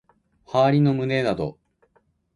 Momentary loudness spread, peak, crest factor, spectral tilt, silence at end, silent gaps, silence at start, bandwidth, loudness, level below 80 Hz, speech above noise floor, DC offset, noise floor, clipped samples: 10 LU; -8 dBFS; 16 dB; -8 dB/octave; 0.85 s; none; 0.5 s; 10.5 kHz; -22 LUFS; -56 dBFS; 45 dB; under 0.1%; -65 dBFS; under 0.1%